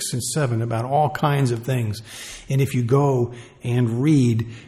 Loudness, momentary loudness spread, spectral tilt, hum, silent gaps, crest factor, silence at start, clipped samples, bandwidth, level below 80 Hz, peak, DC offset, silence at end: -21 LUFS; 10 LU; -6.5 dB/octave; none; none; 14 dB; 0 s; under 0.1%; 14 kHz; -54 dBFS; -6 dBFS; under 0.1%; 0 s